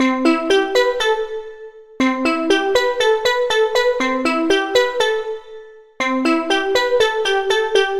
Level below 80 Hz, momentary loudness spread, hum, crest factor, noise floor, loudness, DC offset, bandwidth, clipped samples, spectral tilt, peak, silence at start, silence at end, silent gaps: -50 dBFS; 7 LU; none; 16 dB; -39 dBFS; -17 LUFS; under 0.1%; 15 kHz; under 0.1%; -2 dB/octave; -2 dBFS; 0 s; 0 s; none